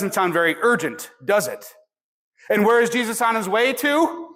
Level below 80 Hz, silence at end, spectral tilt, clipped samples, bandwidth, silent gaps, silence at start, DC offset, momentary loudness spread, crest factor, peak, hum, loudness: -70 dBFS; 0.05 s; -3.5 dB/octave; under 0.1%; 16.5 kHz; 2.04-2.32 s; 0 s; under 0.1%; 10 LU; 14 dB; -8 dBFS; none; -20 LUFS